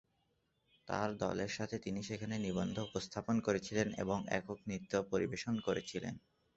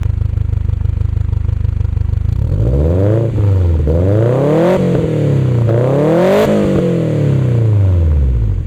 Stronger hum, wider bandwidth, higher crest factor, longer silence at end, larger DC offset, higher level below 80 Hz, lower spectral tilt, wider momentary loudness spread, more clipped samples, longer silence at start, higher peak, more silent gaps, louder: neither; second, 8 kHz vs 9 kHz; first, 20 dB vs 8 dB; first, 0.4 s vs 0 s; neither; second, -64 dBFS vs -20 dBFS; second, -5 dB/octave vs -9 dB/octave; about the same, 7 LU vs 6 LU; neither; first, 0.85 s vs 0 s; second, -18 dBFS vs -2 dBFS; neither; second, -39 LUFS vs -13 LUFS